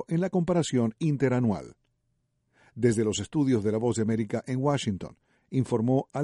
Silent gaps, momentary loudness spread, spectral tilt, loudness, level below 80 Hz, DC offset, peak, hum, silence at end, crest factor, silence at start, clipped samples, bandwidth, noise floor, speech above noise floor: none; 6 LU; -6.5 dB/octave; -27 LUFS; -60 dBFS; under 0.1%; -10 dBFS; none; 0 s; 16 dB; 0 s; under 0.1%; 11.5 kHz; -75 dBFS; 49 dB